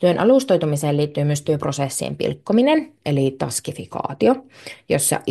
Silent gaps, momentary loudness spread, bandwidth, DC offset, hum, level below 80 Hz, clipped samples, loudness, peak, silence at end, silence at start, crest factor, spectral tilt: none; 10 LU; 12.5 kHz; under 0.1%; none; -58 dBFS; under 0.1%; -20 LUFS; -4 dBFS; 0 s; 0 s; 16 dB; -5.5 dB/octave